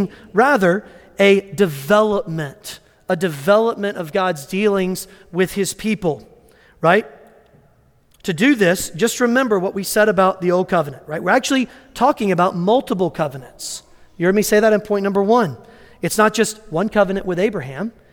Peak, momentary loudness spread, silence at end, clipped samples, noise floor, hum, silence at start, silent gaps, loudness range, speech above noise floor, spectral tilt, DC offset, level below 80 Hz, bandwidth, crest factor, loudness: -2 dBFS; 13 LU; 0.2 s; under 0.1%; -55 dBFS; none; 0 s; none; 3 LU; 37 dB; -5 dB/octave; under 0.1%; -50 dBFS; 18.5 kHz; 16 dB; -18 LUFS